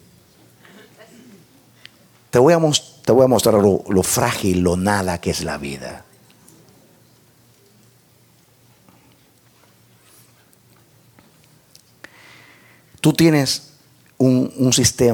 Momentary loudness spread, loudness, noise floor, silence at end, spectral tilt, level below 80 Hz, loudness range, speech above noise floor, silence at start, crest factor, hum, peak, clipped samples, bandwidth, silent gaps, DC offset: 12 LU; -17 LUFS; -54 dBFS; 0 s; -4.5 dB/octave; -50 dBFS; 12 LU; 38 dB; 2.35 s; 20 dB; none; -2 dBFS; under 0.1%; 19.5 kHz; none; under 0.1%